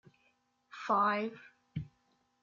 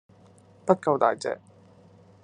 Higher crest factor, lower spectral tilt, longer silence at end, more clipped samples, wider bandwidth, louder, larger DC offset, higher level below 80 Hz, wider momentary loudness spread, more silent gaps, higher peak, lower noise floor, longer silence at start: second, 18 dB vs 26 dB; second, -4 dB/octave vs -6 dB/octave; second, 0.55 s vs 0.85 s; neither; second, 7.4 kHz vs 10.5 kHz; second, -34 LUFS vs -25 LUFS; neither; first, -70 dBFS vs -76 dBFS; first, 23 LU vs 13 LU; neither; second, -18 dBFS vs -4 dBFS; first, -75 dBFS vs -55 dBFS; about the same, 0.75 s vs 0.65 s